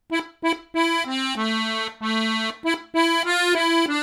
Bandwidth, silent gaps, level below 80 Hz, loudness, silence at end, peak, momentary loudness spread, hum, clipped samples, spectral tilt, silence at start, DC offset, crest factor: 15 kHz; none; -66 dBFS; -22 LUFS; 0 s; -6 dBFS; 7 LU; none; under 0.1%; -2.5 dB/octave; 0.1 s; under 0.1%; 16 dB